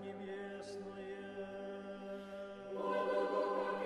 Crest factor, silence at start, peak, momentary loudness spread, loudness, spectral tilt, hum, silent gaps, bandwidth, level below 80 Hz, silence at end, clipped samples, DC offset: 16 dB; 0 s; -24 dBFS; 11 LU; -42 LUFS; -6 dB/octave; none; none; 12 kHz; -76 dBFS; 0 s; under 0.1%; under 0.1%